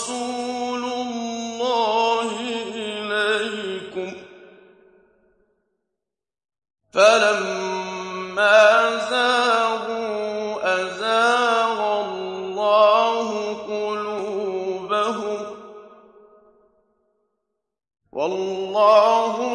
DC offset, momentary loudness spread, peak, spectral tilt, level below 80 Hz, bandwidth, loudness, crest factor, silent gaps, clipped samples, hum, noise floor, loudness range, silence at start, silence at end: under 0.1%; 14 LU; -2 dBFS; -2.5 dB/octave; -70 dBFS; 11 kHz; -21 LUFS; 20 dB; none; under 0.1%; none; -88 dBFS; 12 LU; 0 s; 0 s